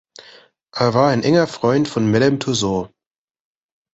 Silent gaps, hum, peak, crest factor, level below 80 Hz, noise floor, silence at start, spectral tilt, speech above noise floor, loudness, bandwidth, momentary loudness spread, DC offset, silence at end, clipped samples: none; none; -2 dBFS; 18 dB; -52 dBFS; -48 dBFS; 0.75 s; -5.5 dB/octave; 31 dB; -17 LUFS; 8.2 kHz; 9 LU; under 0.1%; 1.1 s; under 0.1%